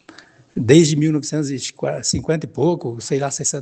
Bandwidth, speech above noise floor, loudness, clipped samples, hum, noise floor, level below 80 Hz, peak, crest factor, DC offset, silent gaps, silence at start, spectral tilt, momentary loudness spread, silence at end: 11 kHz; 28 dB; -19 LUFS; under 0.1%; none; -46 dBFS; -50 dBFS; 0 dBFS; 18 dB; under 0.1%; none; 0.55 s; -5 dB/octave; 12 LU; 0 s